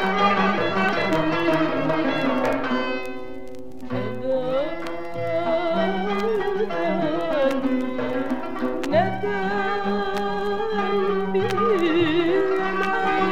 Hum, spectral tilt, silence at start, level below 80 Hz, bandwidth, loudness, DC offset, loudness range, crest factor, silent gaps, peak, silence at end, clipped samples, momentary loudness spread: none; -6.5 dB/octave; 0 s; -50 dBFS; 15.5 kHz; -23 LUFS; 2%; 4 LU; 14 dB; none; -8 dBFS; 0 s; under 0.1%; 9 LU